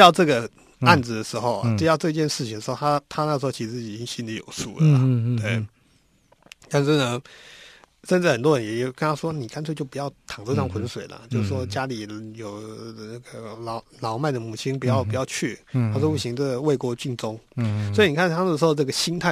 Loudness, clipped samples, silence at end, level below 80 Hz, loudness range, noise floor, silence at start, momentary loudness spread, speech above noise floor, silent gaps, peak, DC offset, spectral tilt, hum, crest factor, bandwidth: -23 LUFS; under 0.1%; 0 s; -58 dBFS; 7 LU; -61 dBFS; 0 s; 16 LU; 38 dB; none; 0 dBFS; under 0.1%; -5.5 dB/octave; none; 24 dB; 14 kHz